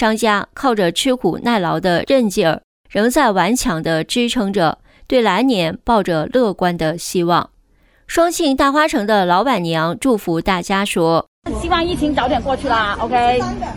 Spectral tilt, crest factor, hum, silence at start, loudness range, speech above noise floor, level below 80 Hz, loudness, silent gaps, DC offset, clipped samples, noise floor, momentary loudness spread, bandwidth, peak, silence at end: -4.5 dB/octave; 14 dB; none; 0 s; 1 LU; 38 dB; -38 dBFS; -16 LUFS; 2.64-2.84 s, 11.28-11.42 s; under 0.1%; under 0.1%; -54 dBFS; 5 LU; 19 kHz; -2 dBFS; 0 s